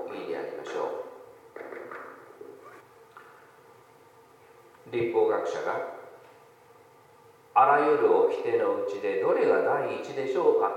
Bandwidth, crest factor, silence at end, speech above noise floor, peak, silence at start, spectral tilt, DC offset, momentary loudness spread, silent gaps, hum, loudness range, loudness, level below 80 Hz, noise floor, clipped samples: 9.6 kHz; 20 dB; 0 s; 31 dB; -8 dBFS; 0 s; -6 dB/octave; under 0.1%; 24 LU; none; none; 21 LU; -26 LUFS; -80 dBFS; -56 dBFS; under 0.1%